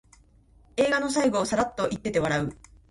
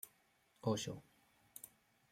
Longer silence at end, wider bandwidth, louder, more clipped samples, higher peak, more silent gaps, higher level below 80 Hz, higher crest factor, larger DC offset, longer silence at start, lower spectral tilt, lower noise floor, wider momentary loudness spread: about the same, 0.35 s vs 0.45 s; second, 11.5 kHz vs 16 kHz; first, -26 LUFS vs -43 LUFS; neither; first, -10 dBFS vs -24 dBFS; neither; first, -52 dBFS vs -78 dBFS; second, 16 dB vs 24 dB; neither; first, 0.75 s vs 0.05 s; about the same, -4.5 dB/octave vs -5 dB/octave; second, -57 dBFS vs -75 dBFS; second, 6 LU vs 18 LU